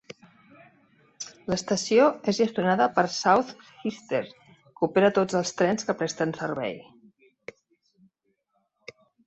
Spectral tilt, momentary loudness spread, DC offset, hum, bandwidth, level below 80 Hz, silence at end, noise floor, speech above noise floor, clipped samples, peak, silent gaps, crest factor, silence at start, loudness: -4.5 dB/octave; 19 LU; under 0.1%; none; 8.4 kHz; -66 dBFS; 2.45 s; -74 dBFS; 50 dB; under 0.1%; -6 dBFS; none; 20 dB; 1.2 s; -25 LUFS